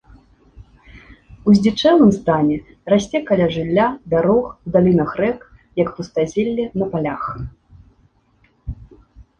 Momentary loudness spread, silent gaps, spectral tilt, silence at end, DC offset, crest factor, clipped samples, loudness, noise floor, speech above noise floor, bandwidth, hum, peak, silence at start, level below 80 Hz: 18 LU; none; -7 dB/octave; 0.15 s; under 0.1%; 16 dB; under 0.1%; -18 LUFS; -58 dBFS; 42 dB; 8.6 kHz; none; -2 dBFS; 0.55 s; -44 dBFS